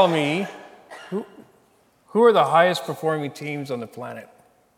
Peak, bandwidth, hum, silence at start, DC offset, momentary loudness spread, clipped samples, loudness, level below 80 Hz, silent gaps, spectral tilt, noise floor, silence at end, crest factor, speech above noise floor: -4 dBFS; 16 kHz; none; 0 s; under 0.1%; 24 LU; under 0.1%; -22 LUFS; -78 dBFS; none; -5.5 dB/octave; -60 dBFS; 0.55 s; 20 dB; 39 dB